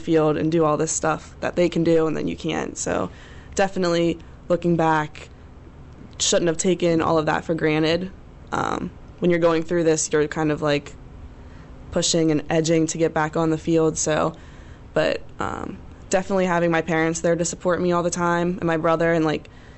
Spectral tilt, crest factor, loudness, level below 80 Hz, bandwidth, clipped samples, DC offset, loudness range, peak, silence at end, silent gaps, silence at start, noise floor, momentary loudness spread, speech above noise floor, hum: -4.5 dB/octave; 12 dB; -22 LUFS; -46 dBFS; 8.4 kHz; under 0.1%; under 0.1%; 2 LU; -10 dBFS; 0.1 s; none; 0 s; -42 dBFS; 10 LU; 21 dB; none